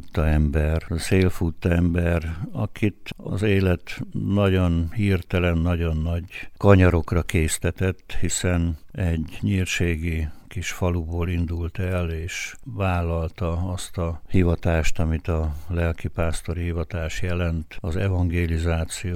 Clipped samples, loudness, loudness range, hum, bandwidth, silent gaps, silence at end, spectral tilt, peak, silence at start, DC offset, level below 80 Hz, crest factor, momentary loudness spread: under 0.1%; -24 LUFS; 5 LU; none; 15 kHz; none; 0 s; -6 dB/octave; -2 dBFS; 0 s; under 0.1%; -32 dBFS; 22 dB; 8 LU